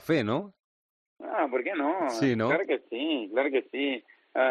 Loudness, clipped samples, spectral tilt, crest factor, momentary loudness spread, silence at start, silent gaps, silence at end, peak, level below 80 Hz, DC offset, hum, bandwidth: -29 LUFS; under 0.1%; -6 dB/octave; 18 dB; 8 LU; 0.05 s; 0.64-1.16 s; 0 s; -12 dBFS; -74 dBFS; under 0.1%; none; 11 kHz